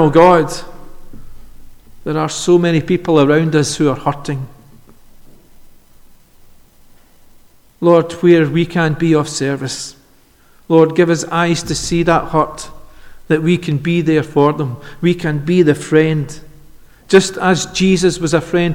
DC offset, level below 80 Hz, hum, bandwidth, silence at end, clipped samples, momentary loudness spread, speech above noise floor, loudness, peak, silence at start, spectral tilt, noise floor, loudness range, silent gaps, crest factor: under 0.1%; -40 dBFS; none; 15.5 kHz; 0 s; under 0.1%; 12 LU; 35 dB; -14 LUFS; 0 dBFS; 0 s; -5.5 dB/octave; -48 dBFS; 5 LU; none; 16 dB